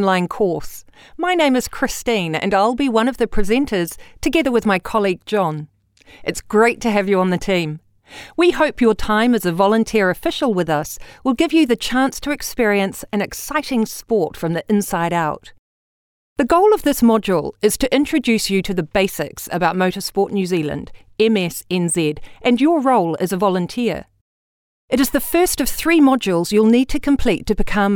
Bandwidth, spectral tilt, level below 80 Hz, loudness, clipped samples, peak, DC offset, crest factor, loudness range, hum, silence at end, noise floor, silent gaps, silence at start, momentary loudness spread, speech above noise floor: over 20 kHz; -5 dB/octave; -36 dBFS; -18 LUFS; under 0.1%; -2 dBFS; under 0.1%; 16 dB; 3 LU; none; 0 s; under -90 dBFS; 15.59-16.36 s, 24.21-24.88 s; 0 s; 9 LU; over 73 dB